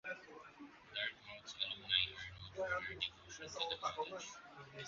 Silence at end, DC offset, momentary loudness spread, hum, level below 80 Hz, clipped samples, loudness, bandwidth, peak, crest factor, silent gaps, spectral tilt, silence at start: 0 s; under 0.1%; 20 LU; none; -70 dBFS; under 0.1%; -42 LUFS; 7.4 kHz; -18 dBFS; 26 dB; none; 0.5 dB/octave; 0.05 s